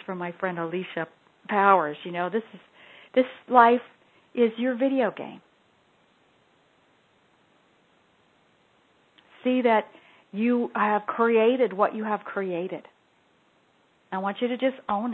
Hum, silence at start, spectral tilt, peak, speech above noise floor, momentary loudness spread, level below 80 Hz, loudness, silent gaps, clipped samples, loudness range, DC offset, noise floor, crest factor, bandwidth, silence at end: none; 0.1 s; -8.5 dB/octave; -2 dBFS; 40 dB; 15 LU; -78 dBFS; -25 LUFS; none; under 0.1%; 7 LU; under 0.1%; -64 dBFS; 24 dB; 4.3 kHz; 0 s